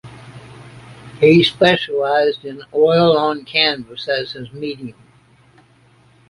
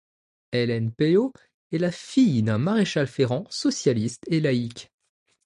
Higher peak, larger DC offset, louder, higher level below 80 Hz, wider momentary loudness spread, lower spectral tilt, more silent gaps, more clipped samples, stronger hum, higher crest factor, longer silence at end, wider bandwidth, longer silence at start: first, -2 dBFS vs -8 dBFS; neither; first, -16 LUFS vs -24 LUFS; first, -56 dBFS vs -62 dBFS; first, 16 LU vs 8 LU; about the same, -6 dB/octave vs -6 dB/octave; second, none vs 1.54-1.70 s; neither; neither; about the same, 18 dB vs 16 dB; first, 1.4 s vs 0.6 s; about the same, 11.5 kHz vs 11 kHz; second, 0.05 s vs 0.5 s